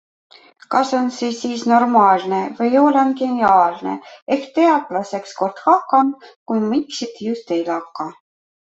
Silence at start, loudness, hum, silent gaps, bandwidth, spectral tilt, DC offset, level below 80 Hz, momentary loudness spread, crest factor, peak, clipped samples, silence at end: 0.7 s; -18 LUFS; none; 4.22-4.27 s, 6.36-6.46 s; 8 kHz; -5 dB/octave; under 0.1%; -64 dBFS; 13 LU; 16 dB; -2 dBFS; under 0.1%; 0.6 s